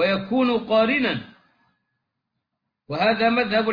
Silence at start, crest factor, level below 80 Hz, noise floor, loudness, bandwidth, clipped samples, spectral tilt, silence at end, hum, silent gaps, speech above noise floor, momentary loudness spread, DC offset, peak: 0 s; 16 dB; -60 dBFS; -80 dBFS; -21 LUFS; 5.2 kHz; under 0.1%; -7.5 dB/octave; 0 s; none; none; 59 dB; 7 LU; under 0.1%; -8 dBFS